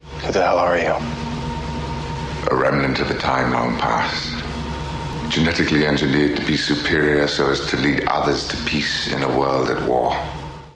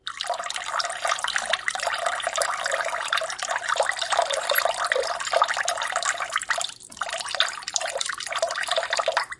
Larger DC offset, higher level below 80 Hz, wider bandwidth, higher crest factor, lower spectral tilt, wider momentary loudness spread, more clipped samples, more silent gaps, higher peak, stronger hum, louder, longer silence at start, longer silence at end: neither; first, -36 dBFS vs -66 dBFS; second, 10 kHz vs 12 kHz; second, 14 dB vs 26 dB; first, -5 dB/octave vs 2 dB/octave; first, 10 LU vs 5 LU; neither; neither; about the same, -4 dBFS vs -2 dBFS; neither; first, -20 LUFS vs -25 LUFS; about the same, 0.05 s vs 0.05 s; about the same, 0.05 s vs 0.05 s